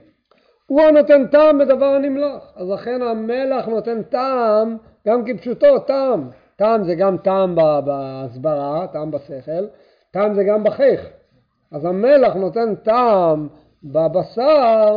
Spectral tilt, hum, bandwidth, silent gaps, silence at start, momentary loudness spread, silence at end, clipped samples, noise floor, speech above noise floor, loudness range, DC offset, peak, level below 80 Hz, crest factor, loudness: -9 dB/octave; none; 5.2 kHz; none; 0.7 s; 14 LU; 0 s; under 0.1%; -60 dBFS; 44 dB; 5 LU; under 0.1%; 0 dBFS; -56 dBFS; 16 dB; -17 LUFS